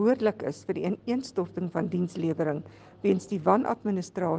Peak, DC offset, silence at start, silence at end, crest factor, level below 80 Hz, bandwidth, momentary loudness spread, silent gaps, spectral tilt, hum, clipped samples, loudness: -8 dBFS; under 0.1%; 0 s; 0 s; 20 dB; -68 dBFS; 9.4 kHz; 8 LU; none; -7.5 dB/octave; none; under 0.1%; -29 LUFS